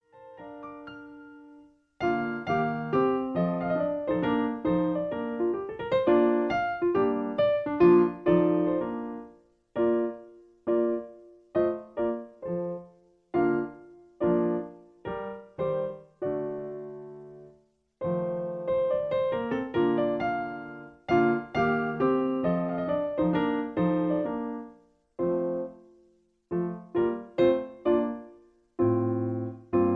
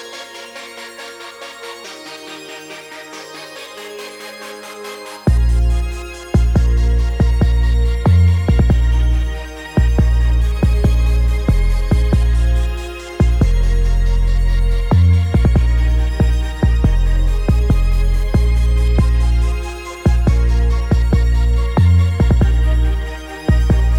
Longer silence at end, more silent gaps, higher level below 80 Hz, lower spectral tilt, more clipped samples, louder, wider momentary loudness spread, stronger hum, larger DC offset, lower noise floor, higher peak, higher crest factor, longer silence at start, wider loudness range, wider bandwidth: about the same, 0 s vs 0 s; neither; second, -60 dBFS vs -16 dBFS; first, -9.5 dB/octave vs -7 dB/octave; neither; second, -28 LUFS vs -16 LUFS; about the same, 17 LU vs 17 LU; neither; neither; first, -65 dBFS vs -33 dBFS; second, -8 dBFS vs 0 dBFS; first, 20 dB vs 14 dB; first, 0.15 s vs 0 s; second, 7 LU vs 15 LU; second, 5 kHz vs 11 kHz